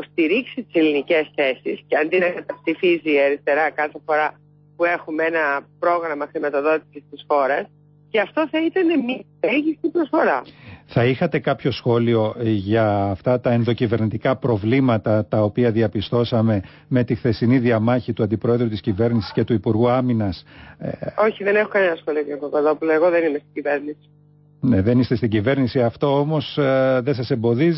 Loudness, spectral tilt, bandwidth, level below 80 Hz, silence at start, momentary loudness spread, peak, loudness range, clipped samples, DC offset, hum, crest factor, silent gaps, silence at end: -20 LUFS; -11.5 dB/octave; 5.8 kHz; -48 dBFS; 0 s; 7 LU; -6 dBFS; 2 LU; under 0.1%; under 0.1%; 50 Hz at -50 dBFS; 14 dB; none; 0 s